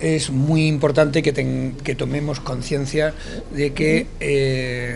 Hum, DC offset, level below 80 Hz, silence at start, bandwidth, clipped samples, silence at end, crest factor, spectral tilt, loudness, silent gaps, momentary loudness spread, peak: none; under 0.1%; -36 dBFS; 0 s; 11.5 kHz; under 0.1%; 0 s; 18 dB; -6 dB/octave; -20 LUFS; none; 8 LU; -2 dBFS